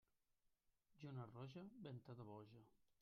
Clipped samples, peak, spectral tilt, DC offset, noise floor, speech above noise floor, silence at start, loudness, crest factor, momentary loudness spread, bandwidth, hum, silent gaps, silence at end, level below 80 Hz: under 0.1%; -42 dBFS; -7 dB/octave; under 0.1%; -86 dBFS; 27 dB; 0.9 s; -58 LUFS; 18 dB; 6 LU; 6.4 kHz; none; none; 0.1 s; -88 dBFS